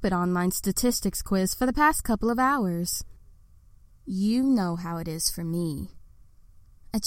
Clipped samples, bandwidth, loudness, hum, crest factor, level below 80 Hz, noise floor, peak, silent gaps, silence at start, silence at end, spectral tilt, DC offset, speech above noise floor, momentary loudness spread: under 0.1%; 16.5 kHz; -26 LUFS; none; 18 dB; -42 dBFS; -53 dBFS; -10 dBFS; none; 0 s; 0 s; -4.5 dB/octave; under 0.1%; 28 dB; 10 LU